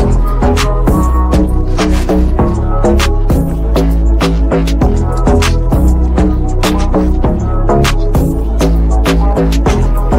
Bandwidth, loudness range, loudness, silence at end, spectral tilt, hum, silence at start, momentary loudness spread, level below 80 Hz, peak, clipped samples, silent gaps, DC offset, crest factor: 16 kHz; 0 LU; -12 LUFS; 0 s; -6.5 dB/octave; none; 0 s; 2 LU; -12 dBFS; 0 dBFS; under 0.1%; none; under 0.1%; 8 dB